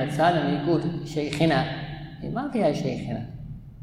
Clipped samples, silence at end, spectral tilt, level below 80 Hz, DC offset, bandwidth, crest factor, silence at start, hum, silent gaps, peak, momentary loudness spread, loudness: under 0.1%; 0 s; -6.5 dB/octave; -48 dBFS; under 0.1%; 13 kHz; 18 dB; 0 s; none; none; -8 dBFS; 15 LU; -26 LUFS